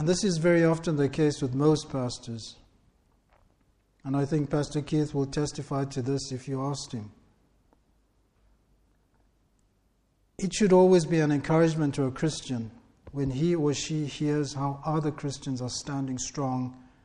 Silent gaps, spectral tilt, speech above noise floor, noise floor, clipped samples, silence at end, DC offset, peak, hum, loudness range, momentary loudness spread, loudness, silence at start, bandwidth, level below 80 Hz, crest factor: none; -6 dB/octave; 42 dB; -69 dBFS; under 0.1%; 0.2 s; under 0.1%; -10 dBFS; none; 10 LU; 13 LU; -27 LUFS; 0 s; 10.5 kHz; -54 dBFS; 18 dB